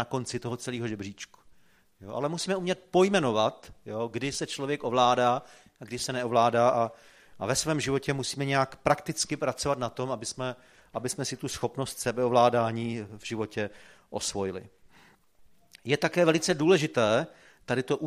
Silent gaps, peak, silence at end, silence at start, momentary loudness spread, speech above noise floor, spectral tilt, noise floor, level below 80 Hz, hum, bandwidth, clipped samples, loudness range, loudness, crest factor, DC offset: none; -6 dBFS; 0 s; 0 s; 14 LU; 32 dB; -4.5 dB/octave; -60 dBFS; -60 dBFS; none; 15.5 kHz; under 0.1%; 4 LU; -28 LUFS; 22 dB; under 0.1%